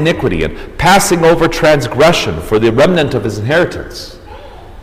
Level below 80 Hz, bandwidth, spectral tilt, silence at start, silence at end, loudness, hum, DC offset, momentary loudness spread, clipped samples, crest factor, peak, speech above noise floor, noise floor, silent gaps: -30 dBFS; 16 kHz; -5 dB/octave; 0 s; 0 s; -11 LUFS; none; under 0.1%; 11 LU; under 0.1%; 12 dB; 0 dBFS; 20 dB; -31 dBFS; none